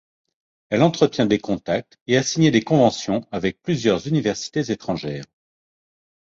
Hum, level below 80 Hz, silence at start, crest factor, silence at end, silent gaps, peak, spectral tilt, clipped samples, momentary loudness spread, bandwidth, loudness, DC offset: none; -54 dBFS; 0.7 s; 20 dB; 0.95 s; 2.01-2.06 s; -2 dBFS; -5.5 dB/octave; under 0.1%; 9 LU; 7.8 kHz; -21 LUFS; under 0.1%